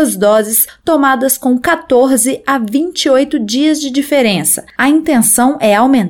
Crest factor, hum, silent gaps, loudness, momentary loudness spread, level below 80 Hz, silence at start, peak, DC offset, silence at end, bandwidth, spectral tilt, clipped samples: 10 dB; none; none; -11 LUFS; 5 LU; -48 dBFS; 0 s; 0 dBFS; 0.2%; 0 s; 19 kHz; -3 dB/octave; under 0.1%